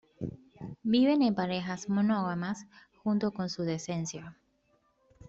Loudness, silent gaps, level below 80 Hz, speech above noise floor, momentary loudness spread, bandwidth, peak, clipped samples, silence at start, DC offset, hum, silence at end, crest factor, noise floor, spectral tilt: -31 LUFS; none; -66 dBFS; 42 dB; 16 LU; 8 kHz; -16 dBFS; under 0.1%; 0.2 s; under 0.1%; none; 0.95 s; 16 dB; -71 dBFS; -6 dB/octave